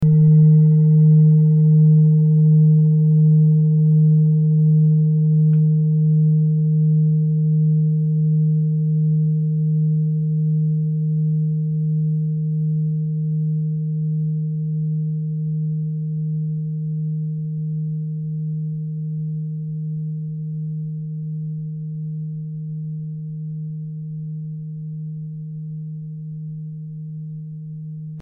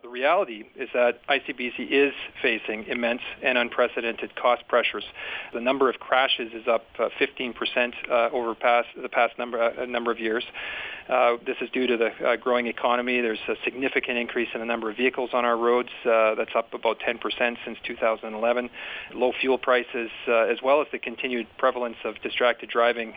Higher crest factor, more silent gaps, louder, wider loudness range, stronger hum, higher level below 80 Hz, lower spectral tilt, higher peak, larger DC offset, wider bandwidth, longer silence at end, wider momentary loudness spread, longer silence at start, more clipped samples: second, 12 dB vs 20 dB; neither; first, -18 LUFS vs -25 LUFS; first, 15 LU vs 1 LU; neither; about the same, -60 dBFS vs -64 dBFS; first, -15.5 dB/octave vs -6 dB/octave; about the same, -6 dBFS vs -6 dBFS; neither; second, 0.9 kHz vs 5 kHz; about the same, 0 s vs 0 s; first, 17 LU vs 8 LU; about the same, 0 s vs 0.05 s; neither